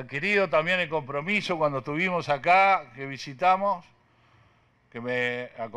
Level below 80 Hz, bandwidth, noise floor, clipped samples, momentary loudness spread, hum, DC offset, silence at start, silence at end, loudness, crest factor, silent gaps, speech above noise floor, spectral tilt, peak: -64 dBFS; 10.5 kHz; -63 dBFS; under 0.1%; 15 LU; none; under 0.1%; 0 s; 0 s; -25 LUFS; 16 dB; none; 37 dB; -5.5 dB/octave; -10 dBFS